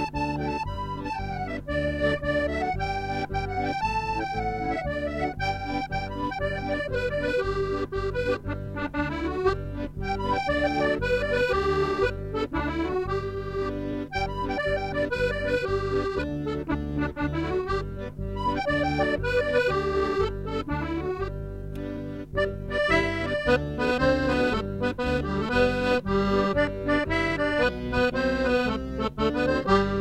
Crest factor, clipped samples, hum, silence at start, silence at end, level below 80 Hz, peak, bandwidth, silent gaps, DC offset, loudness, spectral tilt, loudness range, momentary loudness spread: 18 dB; under 0.1%; none; 0 s; 0 s; -38 dBFS; -8 dBFS; 13.5 kHz; none; under 0.1%; -27 LUFS; -6.5 dB/octave; 4 LU; 8 LU